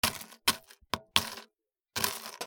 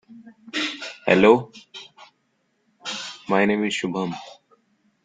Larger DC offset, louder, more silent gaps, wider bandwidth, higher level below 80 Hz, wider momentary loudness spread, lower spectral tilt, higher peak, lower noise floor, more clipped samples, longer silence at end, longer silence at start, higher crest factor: neither; second, -32 LUFS vs -22 LUFS; neither; first, over 20 kHz vs 9.4 kHz; about the same, -62 dBFS vs -62 dBFS; second, 10 LU vs 22 LU; second, -1 dB/octave vs -5 dB/octave; about the same, -2 dBFS vs -2 dBFS; first, -76 dBFS vs -70 dBFS; neither; second, 0 s vs 0.7 s; about the same, 0.05 s vs 0.1 s; first, 34 dB vs 22 dB